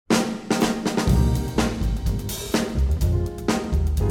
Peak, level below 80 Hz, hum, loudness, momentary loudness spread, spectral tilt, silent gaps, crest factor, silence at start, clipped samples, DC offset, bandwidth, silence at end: -6 dBFS; -26 dBFS; none; -23 LUFS; 5 LU; -5.5 dB/octave; none; 16 dB; 0.1 s; under 0.1%; under 0.1%; 17.5 kHz; 0 s